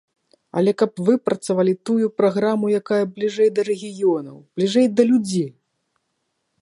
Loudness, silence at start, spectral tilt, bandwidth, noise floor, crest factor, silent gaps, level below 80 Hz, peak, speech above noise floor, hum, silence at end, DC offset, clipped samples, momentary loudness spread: -20 LUFS; 0.55 s; -6.5 dB/octave; 11.5 kHz; -74 dBFS; 18 dB; none; -70 dBFS; -4 dBFS; 54 dB; none; 1.1 s; under 0.1%; under 0.1%; 8 LU